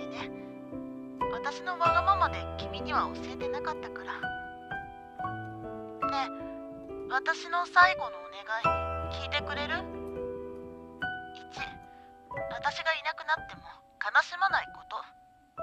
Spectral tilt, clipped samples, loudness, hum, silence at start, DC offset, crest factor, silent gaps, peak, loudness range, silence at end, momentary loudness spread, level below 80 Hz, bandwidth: -4.5 dB/octave; under 0.1%; -31 LUFS; none; 0 s; under 0.1%; 24 dB; none; -8 dBFS; 8 LU; 0 s; 16 LU; -52 dBFS; 12 kHz